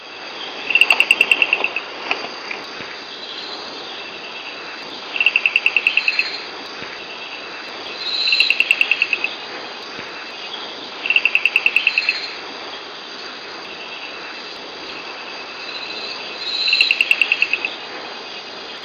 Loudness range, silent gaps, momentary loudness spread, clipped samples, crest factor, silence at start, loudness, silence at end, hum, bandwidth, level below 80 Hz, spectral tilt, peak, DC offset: 10 LU; none; 16 LU; under 0.1%; 22 dB; 0 s; -17 LUFS; 0 s; none; 15.5 kHz; -68 dBFS; -0.5 dB/octave; 0 dBFS; under 0.1%